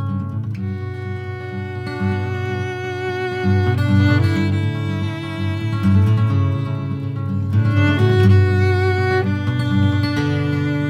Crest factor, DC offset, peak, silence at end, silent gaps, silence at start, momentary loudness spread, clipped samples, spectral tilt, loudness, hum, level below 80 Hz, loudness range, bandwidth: 14 dB; under 0.1%; -2 dBFS; 0 s; none; 0 s; 11 LU; under 0.1%; -8 dB/octave; -19 LUFS; none; -48 dBFS; 6 LU; 7.4 kHz